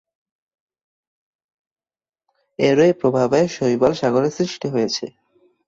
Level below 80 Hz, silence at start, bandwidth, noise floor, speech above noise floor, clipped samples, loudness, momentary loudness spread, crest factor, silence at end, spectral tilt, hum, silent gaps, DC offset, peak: -58 dBFS; 2.6 s; 7.8 kHz; under -90 dBFS; over 72 dB; under 0.1%; -19 LUFS; 9 LU; 18 dB; 0.6 s; -5.5 dB/octave; none; none; under 0.1%; -4 dBFS